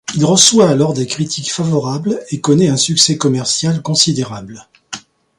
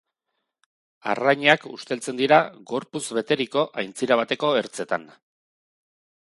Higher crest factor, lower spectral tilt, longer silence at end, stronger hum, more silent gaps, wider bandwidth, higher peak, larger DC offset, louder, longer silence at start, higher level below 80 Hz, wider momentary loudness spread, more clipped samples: second, 14 dB vs 24 dB; about the same, -4 dB/octave vs -4 dB/octave; second, 0.4 s vs 1.15 s; neither; neither; first, 16 kHz vs 11.5 kHz; about the same, 0 dBFS vs 0 dBFS; neither; first, -13 LUFS vs -23 LUFS; second, 0.1 s vs 1.05 s; first, -52 dBFS vs -74 dBFS; first, 18 LU vs 11 LU; neither